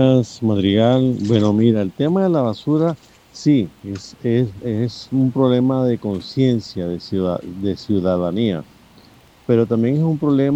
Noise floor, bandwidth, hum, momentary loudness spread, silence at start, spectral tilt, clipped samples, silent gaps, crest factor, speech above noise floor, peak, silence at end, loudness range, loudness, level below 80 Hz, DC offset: -48 dBFS; 8.4 kHz; none; 9 LU; 0 s; -8 dB/octave; under 0.1%; none; 16 dB; 31 dB; -2 dBFS; 0 s; 4 LU; -18 LUFS; -54 dBFS; under 0.1%